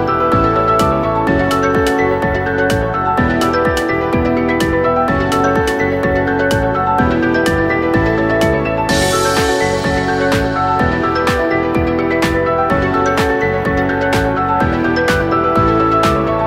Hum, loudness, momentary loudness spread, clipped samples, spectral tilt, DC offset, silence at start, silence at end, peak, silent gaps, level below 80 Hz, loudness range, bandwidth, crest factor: none; -14 LUFS; 2 LU; under 0.1%; -5.5 dB/octave; under 0.1%; 0 s; 0 s; 0 dBFS; none; -30 dBFS; 1 LU; 16 kHz; 12 dB